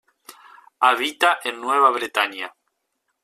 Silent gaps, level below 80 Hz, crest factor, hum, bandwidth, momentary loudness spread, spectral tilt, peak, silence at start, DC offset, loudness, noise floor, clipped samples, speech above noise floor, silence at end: none; -76 dBFS; 20 dB; none; 15 kHz; 8 LU; -0.5 dB/octave; -2 dBFS; 0.3 s; under 0.1%; -20 LUFS; -75 dBFS; under 0.1%; 55 dB; 0.75 s